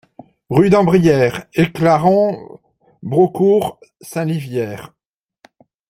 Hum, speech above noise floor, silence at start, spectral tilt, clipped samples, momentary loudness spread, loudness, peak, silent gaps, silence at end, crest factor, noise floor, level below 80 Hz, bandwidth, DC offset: none; 38 dB; 0.5 s; -7.5 dB/octave; under 0.1%; 15 LU; -15 LUFS; -2 dBFS; none; 1.05 s; 16 dB; -53 dBFS; -50 dBFS; 16 kHz; under 0.1%